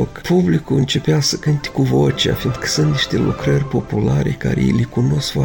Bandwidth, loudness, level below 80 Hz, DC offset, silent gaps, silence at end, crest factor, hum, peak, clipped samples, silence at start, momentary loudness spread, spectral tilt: 17 kHz; -17 LUFS; -36 dBFS; under 0.1%; none; 0 s; 12 dB; none; -4 dBFS; under 0.1%; 0 s; 3 LU; -5.5 dB/octave